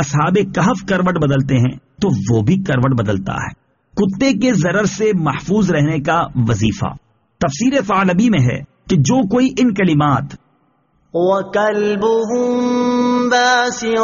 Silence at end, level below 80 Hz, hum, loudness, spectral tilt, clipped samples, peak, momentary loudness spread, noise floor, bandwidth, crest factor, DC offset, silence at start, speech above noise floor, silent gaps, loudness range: 0 s; -42 dBFS; none; -16 LUFS; -6 dB/octave; under 0.1%; -2 dBFS; 7 LU; -59 dBFS; 7.4 kHz; 14 dB; under 0.1%; 0 s; 44 dB; none; 2 LU